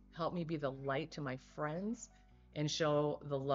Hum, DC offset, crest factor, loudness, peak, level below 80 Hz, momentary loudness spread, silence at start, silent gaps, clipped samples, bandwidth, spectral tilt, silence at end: none; under 0.1%; 18 dB; -39 LUFS; -22 dBFS; -66 dBFS; 10 LU; 0 s; none; under 0.1%; 7.6 kHz; -5 dB/octave; 0 s